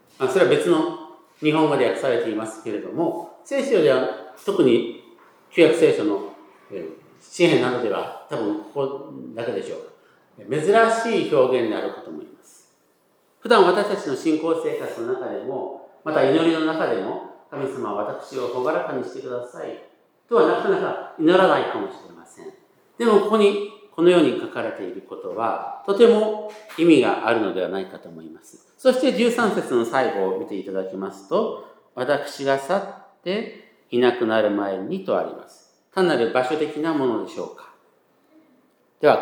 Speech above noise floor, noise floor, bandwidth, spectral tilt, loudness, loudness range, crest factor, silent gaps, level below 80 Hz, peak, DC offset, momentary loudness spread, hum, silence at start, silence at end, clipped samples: 41 dB; -62 dBFS; 17 kHz; -5.5 dB/octave; -21 LUFS; 4 LU; 20 dB; none; -82 dBFS; -2 dBFS; under 0.1%; 18 LU; none; 0.2 s; 0 s; under 0.1%